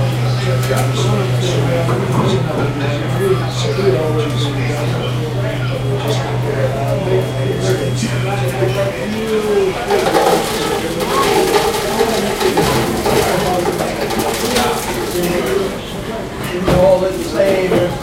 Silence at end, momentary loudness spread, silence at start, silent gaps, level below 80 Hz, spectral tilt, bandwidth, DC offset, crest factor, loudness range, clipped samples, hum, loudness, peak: 0 s; 6 LU; 0 s; none; -34 dBFS; -5.5 dB/octave; 16.5 kHz; under 0.1%; 16 dB; 3 LU; under 0.1%; none; -16 LUFS; 0 dBFS